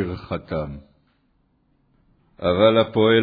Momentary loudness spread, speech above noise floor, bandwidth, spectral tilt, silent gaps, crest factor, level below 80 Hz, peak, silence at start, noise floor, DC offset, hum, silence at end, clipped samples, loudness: 16 LU; 45 dB; 5 kHz; -9 dB/octave; none; 18 dB; -48 dBFS; -4 dBFS; 0 s; -65 dBFS; under 0.1%; none; 0 s; under 0.1%; -20 LUFS